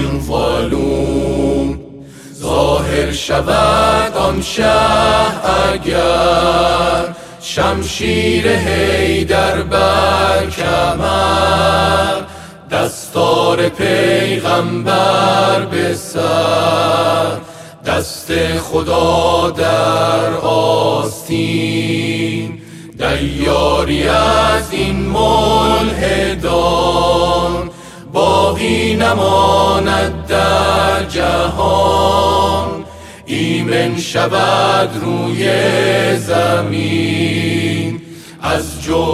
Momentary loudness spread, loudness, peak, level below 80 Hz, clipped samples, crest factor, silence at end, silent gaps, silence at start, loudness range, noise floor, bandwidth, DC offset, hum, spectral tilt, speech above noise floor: 7 LU; -14 LUFS; 0 dBFS; -30 dBFS; under 0.1%; 12 dB; 0 s; none; 0 s; 3 LU; -34 dBFS; 15.5 kHz; 0.3%; none; -5 dB/octave; 20 dB